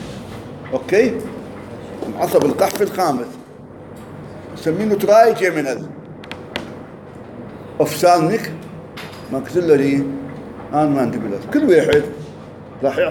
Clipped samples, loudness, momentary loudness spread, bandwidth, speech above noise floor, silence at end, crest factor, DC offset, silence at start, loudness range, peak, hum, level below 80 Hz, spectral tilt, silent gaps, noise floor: under 0.1%; -17 LUFS; 21 LU; 17 kHz; 21 dB; 0 s; 18 dB; under 0.1%; 0 s; 4 LU; 0 dBFS; none; -52 dBFS; -5.5 dB/octave; none; -37 dBFS